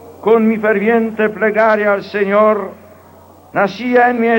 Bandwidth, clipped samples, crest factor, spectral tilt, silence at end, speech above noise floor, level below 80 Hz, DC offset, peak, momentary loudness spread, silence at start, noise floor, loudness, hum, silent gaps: 16.5 kHz; under 0.1%; 14 dB; -7.5 dB/octave; 0 s; 29 dB; -60 dBFS; under 0.1%; -2 dBFS; 5 LU; 0.05 s; -42 dBFS; -14 LUFS; none; none